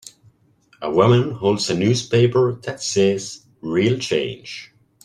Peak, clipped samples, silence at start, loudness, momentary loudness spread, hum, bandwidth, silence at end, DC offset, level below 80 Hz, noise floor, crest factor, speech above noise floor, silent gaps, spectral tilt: -2 dBFS; under 0.1%; 0.8 s; -19 LUFS; 17 LU; none; 11.5 kHz; 0.4 s; under 0.1%; -56 dBFS; -57 dBFS; 18 dB; 39 dB; none; -5.5 dB/octave